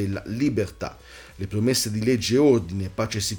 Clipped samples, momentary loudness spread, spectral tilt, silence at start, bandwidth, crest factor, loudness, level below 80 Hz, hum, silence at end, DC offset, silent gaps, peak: under 0.1%; 16 LU; -5 dB/octave; 0 s; over 20 kHz; 16 dB; -23 LUFS; -48 dBFS; none; 0 s; under 0.1%; none; -8 dBFS